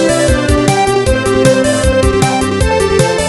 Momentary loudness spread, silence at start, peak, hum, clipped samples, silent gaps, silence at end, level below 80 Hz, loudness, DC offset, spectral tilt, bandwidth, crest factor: 2 LU; 0 s; 0 dBFS; none; under 0.1%; none; 0 s; -20 dBFS; -11 LUFS; under 0.1%; -5 dB/octave; 14.5 kHz; 10 dB